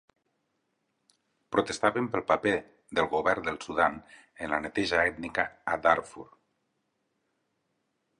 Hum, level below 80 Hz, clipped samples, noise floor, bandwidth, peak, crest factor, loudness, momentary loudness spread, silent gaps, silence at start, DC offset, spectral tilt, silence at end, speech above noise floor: none; -60 dBFS; under 0.1%; -78 dBFS; 11 kHz; -6 dBFS; 24 dB; -28 LUFS; 7 LU; none; 1.5 s; under 0.1%; -4.5 dB/octave; 1.95 s; 49 dB